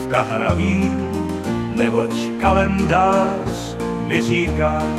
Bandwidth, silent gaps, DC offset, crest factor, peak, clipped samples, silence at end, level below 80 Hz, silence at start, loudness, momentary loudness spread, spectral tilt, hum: 14 kHz; none; under 0.1%; 16 dB; -2 dBFS; under 0.1%; 0 s; -36 dBFS; 0 s; -19 LUFS; 8 LU; -6.5 dB/octave; none